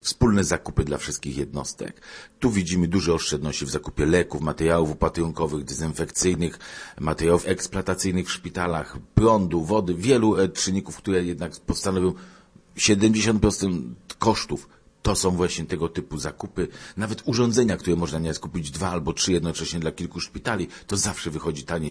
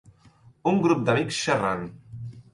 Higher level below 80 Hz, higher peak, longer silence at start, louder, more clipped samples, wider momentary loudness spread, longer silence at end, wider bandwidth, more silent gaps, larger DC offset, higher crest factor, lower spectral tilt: first, -40 dBFS vs -58 dBFS; first, -2 dBFS vs -8 dBFS; second, 0.05 s vs 0.65 s; about the same, -24 LUFS vs -24 LUFS; neither; second, 11 LU vs 18 LU; second, 0 s vs 0.15 s; about the same, 11 kHz vs 11.5 kHz; neither; neither; about the same, 22 dB vs 18 dB; about the same, -5 dB/octave vs -5.5 dB/octave